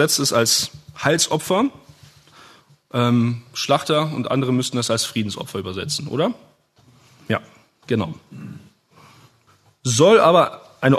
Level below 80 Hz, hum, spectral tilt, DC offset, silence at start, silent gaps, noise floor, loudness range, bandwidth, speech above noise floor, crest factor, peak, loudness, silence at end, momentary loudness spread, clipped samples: -60 dBFS; none; -4 dB/octave; under 0.1%; 0 s; none; -57 dBFS; 8 LU; 13.5 kHz; 38 dB; 20 dB; -2 dBFS; -19 LUFS; 0 s; 13 LU; under 0.1%